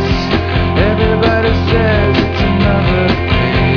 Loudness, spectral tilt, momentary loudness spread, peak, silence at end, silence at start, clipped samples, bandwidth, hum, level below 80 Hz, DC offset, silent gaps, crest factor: -12 LUFS; -7.5 dB/octave; 2 LU; 0 dBFS; 0 s; 0 s; under 0.1%; 5.4 kHz; none; -22 dBFS; 1%; none; 12 dB